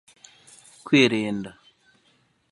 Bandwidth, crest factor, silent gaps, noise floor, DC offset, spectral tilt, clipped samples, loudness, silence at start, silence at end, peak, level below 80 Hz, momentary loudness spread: 11.5 kHz; 22 dB; none; -65 dBFS; under 0.1%; -5 dB/octave; under 0.1%; -21 LUFS; 0.85 s; 1 s; -4 dBFS; -68 dBFS; 22 LU